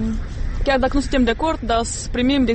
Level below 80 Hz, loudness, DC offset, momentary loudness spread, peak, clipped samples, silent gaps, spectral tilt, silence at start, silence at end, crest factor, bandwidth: -26 dBFS; -20 LUFS; under 0.1%; 7 LU; -6 dBFS; under 0.1%; none; -5 dB/octave; 0 s; 0 s; 12 dB; 8.8 kHz